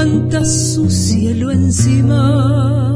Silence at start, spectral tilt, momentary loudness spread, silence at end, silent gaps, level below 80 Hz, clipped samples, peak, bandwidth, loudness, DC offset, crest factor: 0 s; -6 dB/octave; 3 LU; 0 s; none; -32 dBFS; under 0.1%; -2 dBFS; 11 kHz; -13 LUFS; under 0.1%; 10 dB